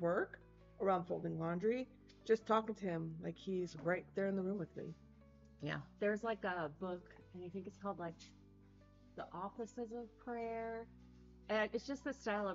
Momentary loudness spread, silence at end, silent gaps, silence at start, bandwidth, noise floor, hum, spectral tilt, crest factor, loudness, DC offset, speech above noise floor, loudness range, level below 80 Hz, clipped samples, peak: 15 LU; 0 s; none; 0 s; 7.6 kHz; -64 dBFS; none; -5 dB/octave; 20 dB; -42 LUFS; under 0.1%; 23 dB; 9 LU; -68 dBFS; under 0.1%; -22 dBFS